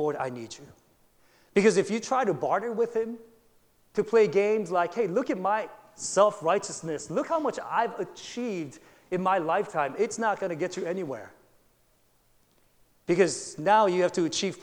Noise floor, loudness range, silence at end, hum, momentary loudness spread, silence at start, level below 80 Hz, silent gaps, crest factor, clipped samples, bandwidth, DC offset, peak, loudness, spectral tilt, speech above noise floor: -66 dBFS; 5 LU; 0 s; none; 13 LU; 0 s; -70 dBFS; none; 20 dB; under 0.1%; 11.5 kHz; under 0.1%; -8 dBFS; -27 LUFS; -4.5 dB/octave; 39 dB